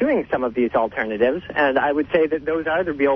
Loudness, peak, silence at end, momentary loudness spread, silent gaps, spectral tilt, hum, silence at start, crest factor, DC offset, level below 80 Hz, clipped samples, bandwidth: -21 LUFS; -6 dBFS; 0 s; 4 LU; none; -8 dB/octave; none; 0 s; 14 dB; under 0.1%; -50 dBFS; under 0.1%; 5.8 kHz